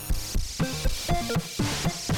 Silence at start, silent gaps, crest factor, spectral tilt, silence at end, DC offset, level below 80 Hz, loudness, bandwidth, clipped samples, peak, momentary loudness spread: 0 s; none; 14 dB; -4 dB/octave; 0 s; under 0.1%; -32 dBFS; -29 LUFS; 18 kHz; under 0.1%; -14 dBFS; 4 LU